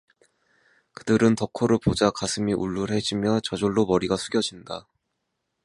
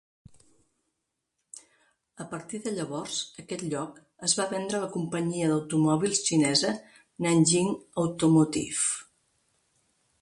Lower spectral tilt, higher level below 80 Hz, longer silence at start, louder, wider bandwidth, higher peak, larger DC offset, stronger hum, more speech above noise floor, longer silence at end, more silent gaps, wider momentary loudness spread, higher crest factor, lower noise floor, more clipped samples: about the same, -5 dB/octave vs -4 dB/octave; first, -50 dBFS vs -66 dBFS; second, 1.05 s vs 1.55 s; first, -24 LUFS vs -27 LUFS; about the same, 11.5 kHz vs 11.5 kHz; first, -4 dBFS vs -10 dBFS; neither; neither; about the same, 55 dB vs 55 dB; second, 0.85 s vs 1.2 s; neither; second, 9 LU vs 16 LU; about the same, 20 dB vs 20 dB; second, -78 dBFS vs -82 dBFS; neither